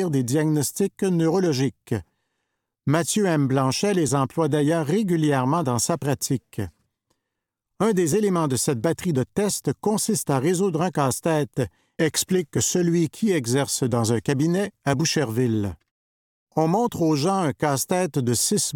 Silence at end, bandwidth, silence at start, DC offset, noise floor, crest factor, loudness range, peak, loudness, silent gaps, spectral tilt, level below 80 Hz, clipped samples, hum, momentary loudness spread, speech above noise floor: 0 s; 18.5 kHz; 0 s; under 0.1%; -83 dBFS; 18 dB; 3 LU; -6 dBFS; -23 LUFS; 15.91-16.47 s; -5 dB/octave; -58 dBFS; under 0.1%; none; 5 LU; 61 dB